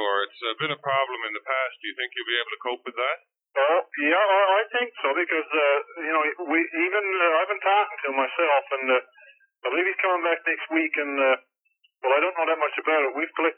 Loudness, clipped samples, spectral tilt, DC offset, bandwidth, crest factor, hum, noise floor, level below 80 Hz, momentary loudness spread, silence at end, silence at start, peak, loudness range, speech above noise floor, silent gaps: -24 LUFS; under 0.1%; -7.5 dB/octave; under 0.1%; 4.2 kHz; 16 dB; none; -68 dBFS; under -90 dBFS; 7 LU; 0.05 s; 0 s; -8 dBFS; 4 LU; 44 dB; none